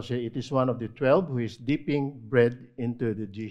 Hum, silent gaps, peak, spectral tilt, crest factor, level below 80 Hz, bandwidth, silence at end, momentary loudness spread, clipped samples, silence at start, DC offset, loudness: none; none; -8 dBFS; -8 dB/octave; 18 dB; -60 dBFS; 9.2 kHz; 0 s; 8 LU; under 0.1%; 0 s; under 0.1%; -27 LUFS